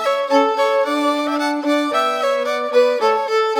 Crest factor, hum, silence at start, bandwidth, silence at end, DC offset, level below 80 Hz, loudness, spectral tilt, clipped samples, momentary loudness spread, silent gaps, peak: 14 dB; none; 0 s; 17.5 kHz; 0 s; under 0.1%; -90 dBFS; -17 LUFS; -2 dB/octave; under 0.1%; 3 LU; none; -4 dBFS